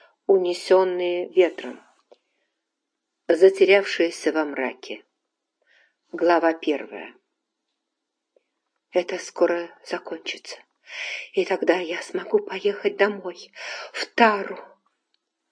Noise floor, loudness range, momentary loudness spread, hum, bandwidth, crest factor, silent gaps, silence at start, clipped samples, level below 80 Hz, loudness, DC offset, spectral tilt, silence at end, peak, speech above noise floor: -81 dBFS; 7 LU; 19 LU; none; 10.5 kHz; 24 dB; none; 0.3 s; under 0.1%; -90 dBFS; -22 LUFS; under 0.1%; -4 dB/octave; 0.85 s; -2 dBFS; 59 dB